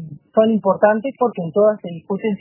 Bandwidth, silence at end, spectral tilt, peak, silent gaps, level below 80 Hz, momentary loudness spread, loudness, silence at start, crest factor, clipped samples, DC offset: 3.1 kHz; 0.05 s; -11.5 dB/octave; 0 dBFS; none; -66 dBFS; 8 LU; -18 LUFS; 0 s; 18 dB; under 0.1%; under 0.1%